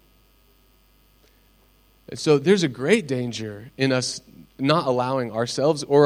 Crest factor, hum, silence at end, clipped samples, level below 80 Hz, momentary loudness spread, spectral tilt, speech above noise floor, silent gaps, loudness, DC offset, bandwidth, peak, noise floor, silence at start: 20 dB; none; 0 s; under 0.1%; -60 dBFS; 12 LU; -5 dB/octave; 37 dB; none; -22 LUFS; under 0.1%; 16 kHz; -4 dBFS; -58 dBFS; 2.1 s